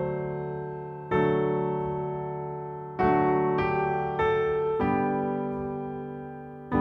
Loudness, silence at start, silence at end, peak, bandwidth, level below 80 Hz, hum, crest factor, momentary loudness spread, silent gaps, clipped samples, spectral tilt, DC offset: -28 LUFS; 0 s; 0 s; -12 dBFS; 6.2 kHz; -52 dBFS; none; 16 dB; 12 LU; none; under 0.1%; -9.5 dB/octave; under 0.1%